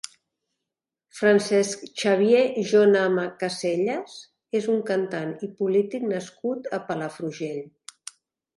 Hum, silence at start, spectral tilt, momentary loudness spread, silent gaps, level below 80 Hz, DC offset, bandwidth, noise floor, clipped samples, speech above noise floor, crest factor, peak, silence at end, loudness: none; 1.15 s; -5 dB/octave; 20 LU; none; -74 dBFS; under 0.1%; 11.5 kHz; -86 dBFS; under 0.1%; 63 dB; 18 dB; -8 dBFS; 0.9 s; -24 LUFS